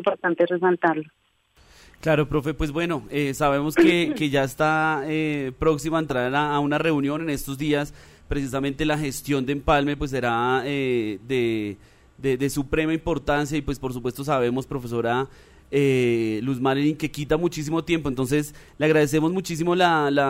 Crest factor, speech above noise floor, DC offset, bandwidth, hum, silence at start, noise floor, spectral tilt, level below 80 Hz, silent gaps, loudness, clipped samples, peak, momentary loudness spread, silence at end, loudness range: 16 dB; 37 dB; under 0.1%; 16 kHz; none; 0 s; -60 dBFS; -6 dB/octave; -42 dBFS; none; -23 LUFS; under 0.1%; -8 dBFS; 8 LU; 0 s; 3 LU